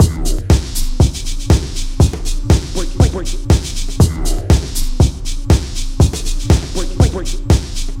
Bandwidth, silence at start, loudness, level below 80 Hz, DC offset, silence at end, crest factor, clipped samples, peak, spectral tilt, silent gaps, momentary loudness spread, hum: 16.5 kHz; 0 s; -16 LUFS; -16 dBFS; under 0.1%; 0 s; 14 dB; under 0.1%; 0 dBFS; -5.5 dB/octave; none; 8 LU; none